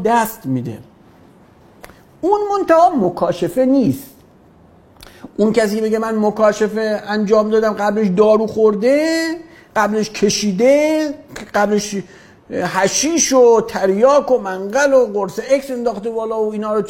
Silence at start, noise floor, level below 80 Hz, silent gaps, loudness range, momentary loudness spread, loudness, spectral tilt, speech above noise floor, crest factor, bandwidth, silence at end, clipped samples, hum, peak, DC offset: 0 s; -47 dBFS; -52 dBFS; none; 4 LU; 11 LU; -16 LUFS; -4.5 dB/octave; 32 dB; 16 dB; 16.5 kHz; 0 s; under 0.1%; none; 0 dBFS; under 0.1%